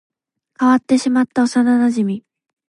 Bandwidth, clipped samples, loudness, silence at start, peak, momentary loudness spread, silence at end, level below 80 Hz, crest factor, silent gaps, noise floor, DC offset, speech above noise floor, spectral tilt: 11 kHz; under 0.1%; -16 LUFS; 0.6 s; -4 dBFS; 7 LU; 0.5 s; -66 dBFS; 14 dB; none; -49 dBFS; under 0.1%; 34 dB; -5.5 dB/octave